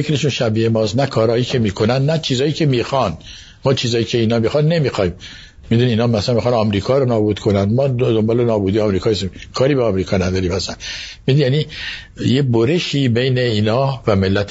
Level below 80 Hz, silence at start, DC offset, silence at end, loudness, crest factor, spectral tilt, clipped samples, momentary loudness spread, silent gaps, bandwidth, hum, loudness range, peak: -42 dBFS; 0 s; under 0.1%; 0 s; -17 LUFS; 16 dB; -6.5 dB/octave; under 0.1%; 7 LU; none; 8 kHz; none; 2 LU; 0 dBFS